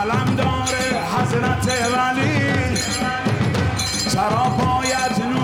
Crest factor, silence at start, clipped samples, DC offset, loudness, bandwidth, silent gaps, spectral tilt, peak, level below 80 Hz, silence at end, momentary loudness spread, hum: 10 dB; 0 s; under 0.1%; under 0.1%; -19 LUFS; 16.5 kHz; none; -4.5 dB/octave; -10 dBFS; -42 dBFS; 0 s; 2 LU; none